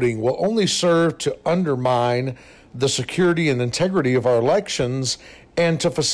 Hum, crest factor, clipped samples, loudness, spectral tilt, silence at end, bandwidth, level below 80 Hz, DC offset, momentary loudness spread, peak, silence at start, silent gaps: none; 8 dB; under 0.1%; -20 LUFS; -4.5 dB/octave; 0 s; 11 kHz; -52 dBFS; under 0.1%; 7 LU; -12 dBFS; 0 s; none